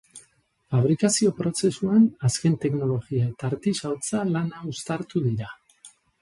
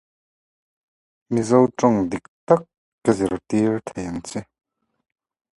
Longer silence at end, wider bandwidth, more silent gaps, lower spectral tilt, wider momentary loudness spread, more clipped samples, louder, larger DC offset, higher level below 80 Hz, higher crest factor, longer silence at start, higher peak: second, 0.35 s vs 1.15 s; about the same, 11.5 kHz vs 11.5 kHz; second, none vs 2.28-2.47 s, 2.77-2.98 s; about the same, -6 dB/octave vs -7 dB/octave; second, 10 LU vs 13 LU; neither; second, -24 LUFS vs -21 LUFS; neither; about the same, -58 dBFS vs -54 dBFS; second, 16 dB vs 22 dB; second, 0.15 s vs 1.3 s; second, -8 dBFS vs 0 dBFS